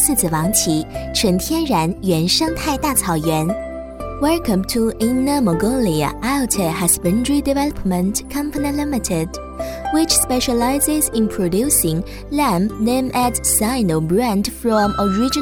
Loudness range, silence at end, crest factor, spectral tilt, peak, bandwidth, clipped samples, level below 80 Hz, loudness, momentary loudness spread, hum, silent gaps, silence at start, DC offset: 2 LU; 0 s; 18 dB; -4 dB/octave; 0 dBFS; 18 kHz; under 0.1%; -34 dBFS; -18 LUFS; 7 LU; none; none; 0 s; under 0.1%